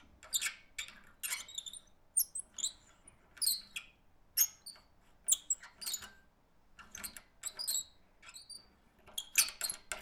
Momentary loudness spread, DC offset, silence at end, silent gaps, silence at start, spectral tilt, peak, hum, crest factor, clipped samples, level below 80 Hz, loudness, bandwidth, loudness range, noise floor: 20 LU; under 0.1%; 0 s; none; 0.2 s; 2.5 dB/octave; -12 dBFS; none; 28 dB; under 0.1%; -70 dBFS; -36 LUFS; over 20 kHz; 7 LU; -67 dBFS